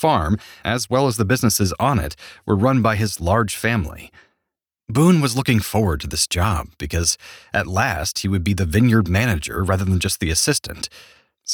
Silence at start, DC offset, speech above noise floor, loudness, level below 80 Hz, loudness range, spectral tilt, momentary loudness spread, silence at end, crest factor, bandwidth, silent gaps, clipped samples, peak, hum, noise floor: 0 s; under 0.1%; 62 dB; -19 LUFS; -36 dBFS; 2 LU; -4.5 dB/octave; 9 LU; 0 s; 16 dB; over 20 kHz; none; under 0.1%; -4 dBFS; none; -81 dBFS